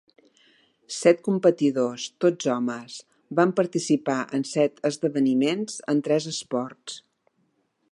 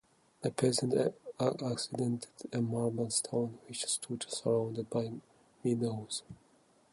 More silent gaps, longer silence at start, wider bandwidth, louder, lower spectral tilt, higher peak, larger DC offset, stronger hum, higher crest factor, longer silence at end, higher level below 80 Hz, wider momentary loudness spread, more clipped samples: neither; first, 0.9 s vs 0.4 s; about the same, 11.5 kHz vs 11.5 kHz; first, -24 LUFS vs -35 LUFS; about the same, -5 dB/octave vs -5 dB/octave; first, -6 dBFS vs -14 dBFS; neither; neither; about the same, 20 dB vs 20 dB; first, 0.9 s vs 0.6 s; second, -78 dBFS vs -72 dBFS; first, 14 LU vs 9 LU; neither